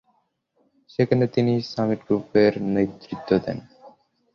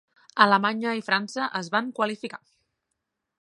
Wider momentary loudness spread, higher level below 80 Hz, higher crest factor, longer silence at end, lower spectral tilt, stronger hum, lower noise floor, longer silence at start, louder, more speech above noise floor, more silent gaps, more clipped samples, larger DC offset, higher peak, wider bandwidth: second, 13 LU vs 16 LU; first, -56 dBFS vs -80 dBFS; second, 20 dB vs 26 dB; second, 0.45 s vs 1.05 s; first, -8.5 dB/octave vs -4.5 dB/octave; neither; second, -69 dBFS vs -81 dBFS; first, 1 s vs 0.35 s; about the same, -23 LUFS vs -24 LUFS; second, 47 dB vs 57 dB; neither; neither; neither; second, -4 dBFS vs 0 dBFS; second, 7 kHz vs 11.5 kHz